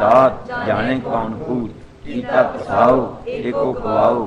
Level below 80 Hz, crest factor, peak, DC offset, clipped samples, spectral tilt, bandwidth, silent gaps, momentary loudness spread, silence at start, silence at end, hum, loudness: -42 dBFS; 16 dB; 0 dBFS; under 0.1%; under 0.1%; -7.5 dB/octave; 8.6 kHz; none; 12 LU; 0 s; 0 s; none; -18 LUFS